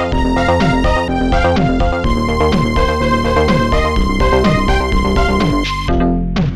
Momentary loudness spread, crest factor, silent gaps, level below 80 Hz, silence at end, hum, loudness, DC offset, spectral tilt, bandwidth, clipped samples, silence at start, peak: 3 LU; 12 dB; none; -18 dBFS; 0 s; none; -14 LUFS; 2%; -6.5 dB/octave; 12 kHz; under 0.1%; 0 s; -2 dBFS